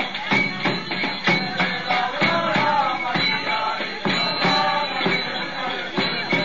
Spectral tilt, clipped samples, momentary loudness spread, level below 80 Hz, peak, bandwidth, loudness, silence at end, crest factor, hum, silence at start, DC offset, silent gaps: -4.5 dB/octave; under 0.1%; 6 LU; -60 dBFS; -8 dBFS; 7.4 kHz; -21 LUFS; 0 s; 14 dB; none; 0 s; 0.9%; none